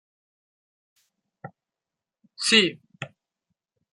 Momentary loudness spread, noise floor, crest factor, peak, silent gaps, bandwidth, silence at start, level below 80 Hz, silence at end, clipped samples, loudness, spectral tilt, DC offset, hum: 22 LU; -89 dBFS; 28 dB; -2 dBFS; none; 11.5 kHz; 1.45 s; -78 dBFS; 0.85 s; under 0.1%; -20 LUFS; -2 dB/octave; under 0.1%; none